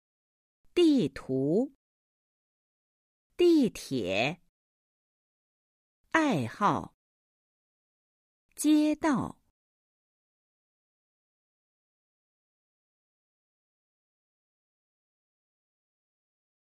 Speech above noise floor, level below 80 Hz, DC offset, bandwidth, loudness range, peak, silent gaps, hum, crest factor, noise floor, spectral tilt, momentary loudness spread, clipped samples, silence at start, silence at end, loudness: over 64 dB; -66 dBFS; under 0.1%; 15 kHz; 3 LU; -10 dBFS; 1.75-3.30 s, 4.49-6.04 s, 6.94-8.49 s; none; 22 dB; under -90 dBFS; -5.5 dB/octave; 10 LU; under 0.1%; 0.75 s; 7.45 s; -28 LUFS